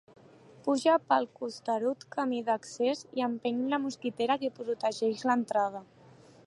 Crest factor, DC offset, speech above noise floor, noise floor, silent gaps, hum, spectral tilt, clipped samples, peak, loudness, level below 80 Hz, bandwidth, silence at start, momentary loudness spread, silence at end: 20 dB; under 0.1%; 26 dB; -56 dBFS; none; none; -4.5 dB/octave; under 0.1%; -12 dBFS; -31 LUFS; -80 dBFS; 11.5 kHz; 0.65 s; 8 LU; 0.6 s